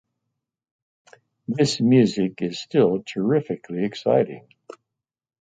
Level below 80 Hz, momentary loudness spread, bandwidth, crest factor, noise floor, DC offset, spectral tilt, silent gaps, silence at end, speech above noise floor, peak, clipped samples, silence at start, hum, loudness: -64 dBFS; 13 LU; 9.4 kHz; 18 dB; -84 dBFS; under 0.1%; -6.5 dB/octave; none; 1.1 s; 63 dB; -4 dBFS; under 0.1%; 1.5 s; none; -22 LUFS